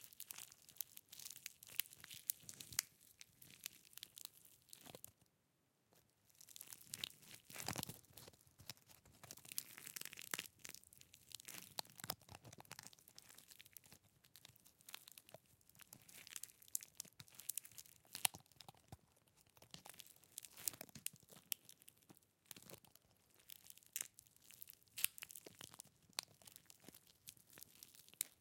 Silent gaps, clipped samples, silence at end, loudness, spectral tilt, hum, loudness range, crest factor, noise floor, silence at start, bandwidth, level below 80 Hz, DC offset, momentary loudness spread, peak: none; under 0.1%; 0 s; -50 LUFS; -0.5 dB/octave; none; 10 LU; 44 dB; -82 dBFS; 0 s; 17 kHz; -86 dBFS; under 0.1%; 18 LU; -10 dBFS